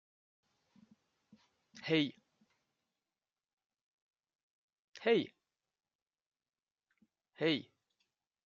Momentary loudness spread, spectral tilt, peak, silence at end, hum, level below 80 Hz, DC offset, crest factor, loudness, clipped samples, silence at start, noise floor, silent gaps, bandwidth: 10 LU; -3.5 dB/octave; -18 dBFS; 0.85 s; none; -88 dBFS; under 0.1%; 24 dB; -36 LUFS; under 0.1%; 1.75 s; under -90 dBFS; 3.53-3.57 s, 3.66-3.70 s, 3.81-4.11 s, 4.35-4.68 s, 4.79-4.93 s, 5.95-6.06 s, 6.26-6.32 s; 7.2 kHz